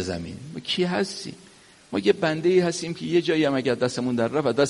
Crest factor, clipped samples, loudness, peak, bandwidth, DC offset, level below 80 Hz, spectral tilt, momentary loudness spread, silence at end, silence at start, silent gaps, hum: 18 dB; under 0.1%; -24 LUFS; -6 dBFS; 11.5 kHz; under 0.1%; -62 dBFS; -5 dB/octave; 12 LU; 0 s; 0 s; none; none